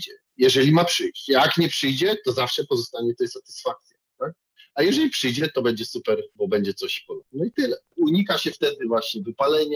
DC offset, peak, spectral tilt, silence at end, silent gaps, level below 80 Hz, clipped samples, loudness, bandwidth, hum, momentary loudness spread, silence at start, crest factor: under 0.1%; -6 dBFS; -4.5 dB/octave; 0 s; none; -68 dBFS; under 0.1%; -22 LUFS; over 20 kHz; none; 12 LU; 0 s; 16 dB